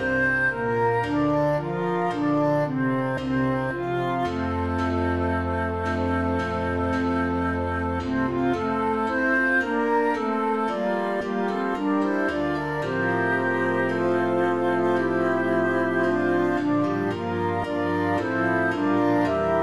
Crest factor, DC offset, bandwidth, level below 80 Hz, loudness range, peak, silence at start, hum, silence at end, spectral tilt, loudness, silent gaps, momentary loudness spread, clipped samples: 14 dB; 0.3%; 12 kHz; -48 dBFS; 2 LU; -10 dBFS; 0 s; none; 0 s; -7.5 dB/octave; -24 LUFS; none; 4 LU; under 0.1%